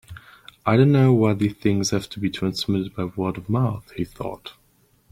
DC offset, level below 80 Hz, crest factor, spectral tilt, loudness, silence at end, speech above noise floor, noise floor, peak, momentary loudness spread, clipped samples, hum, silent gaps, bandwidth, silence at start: under 0.1%; -52 dBFS; 18 dB; -6.5 dB/octave; -22 LUFS; 0.6 s; 40 dB; -61 dBFS; -4 dBFS; 16 LU; under 0.1%; none; none; 15.5 kHz; 0.1 s